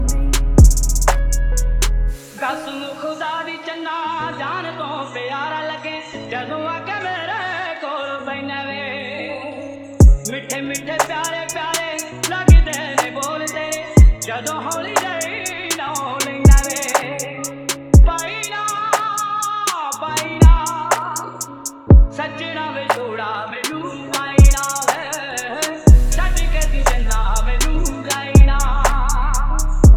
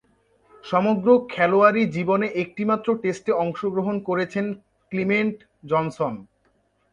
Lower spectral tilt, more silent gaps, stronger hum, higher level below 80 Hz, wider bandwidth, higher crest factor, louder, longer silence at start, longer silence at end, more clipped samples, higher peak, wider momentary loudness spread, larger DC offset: second, -4.5 dB/octave vs -7.5 dB/octave; neither; neither; first, -18 dBFS vs -64 dBFS; first, 19 kHz vs 9.4 kHz; about the same, 16 dB vs 20 dB; first, -18 LUFS vs -22 LUFS; second, 0 s vs 0.65 s; second, 0 s vs 0.7 s; neither; first, 0 dBFS vs -4 dBFS; about the same, 13 LU vs 11 LU; neither